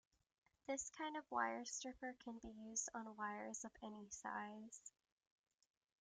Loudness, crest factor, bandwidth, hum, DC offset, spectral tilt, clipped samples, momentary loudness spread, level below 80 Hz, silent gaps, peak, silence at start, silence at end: -49 LUFS; 24 dB; 10.5 kHz; none; under 0.1%; -2 dB/octave; under 0.1%; 12 LU; -80 dBFS; none; -28 dBFS; 0.7 s; 1.1 s